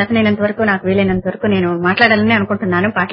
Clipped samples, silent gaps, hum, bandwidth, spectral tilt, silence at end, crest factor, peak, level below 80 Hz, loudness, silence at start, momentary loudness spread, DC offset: under 0.1%; none; none; 5.6 kHz; -9 dB/octave; 0 s; 14 dB; 0 dBFS; -44 dBFS; -14 LUFS; 0 s; 6 LU; under 0.1%